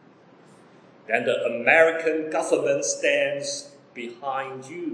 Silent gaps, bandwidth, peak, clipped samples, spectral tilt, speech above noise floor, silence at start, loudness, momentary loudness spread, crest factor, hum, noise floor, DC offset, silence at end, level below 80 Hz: none; 10.5 kHz; -4 dBFS; under 0.1%; -2.5 dB/octave; 29 dB; 1.1 s; -23 LUFS; 17 LU; 20 dB; none; -53 dBFS; under 0.1%; 0 s; -86 dBFS